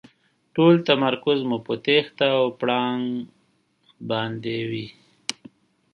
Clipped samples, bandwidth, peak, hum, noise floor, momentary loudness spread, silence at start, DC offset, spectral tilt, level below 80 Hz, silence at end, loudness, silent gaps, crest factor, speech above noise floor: under 0.1%; 11.5 kHz; -2 dBFS; none; -65 dBFS; 15 LU; 0.55 s; under 0.1%; -5.5 dB/octave; -70 dBFS; 0.6 s; -23 LUFS; none; 22 dB; 44 dB